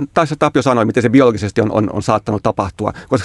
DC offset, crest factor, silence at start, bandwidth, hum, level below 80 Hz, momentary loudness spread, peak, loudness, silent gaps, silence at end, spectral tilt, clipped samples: under 0.1%; 14 dB; 0 s; 11.5 kHz; none; -44 dBFS; 7 LU; 0 dBFS; -15 LUFS; none; 0 s; -6.5 dB/octave; under 0.1%